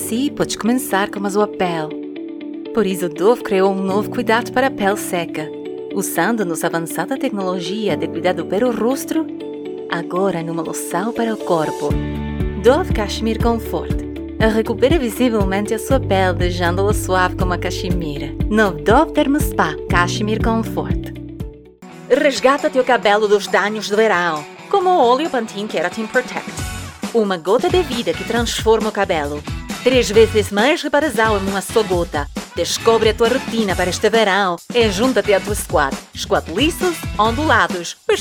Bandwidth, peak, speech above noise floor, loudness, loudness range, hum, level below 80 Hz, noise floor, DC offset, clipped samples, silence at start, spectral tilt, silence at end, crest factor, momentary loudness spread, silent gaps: 19 kHz; 0 dBFS; 22 dB; -18 LUFS; 4 LU; none; -32 dBFS; -38 dBFS; under 0.1%; under 0.1%; 0 s; -5 dB/octave; 0 s; 18 dB; 10 LU; none